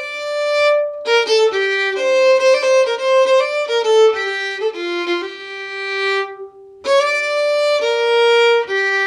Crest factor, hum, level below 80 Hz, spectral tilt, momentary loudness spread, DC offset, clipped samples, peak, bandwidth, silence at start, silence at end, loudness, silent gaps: 12 dB; none; -68 dBFS; -0.5 dB/octave; 10 LU; under 0.1%; under 0.1%; -4 dBFS; 12 kHz; 0 s; 0 s; -15 LUFS; none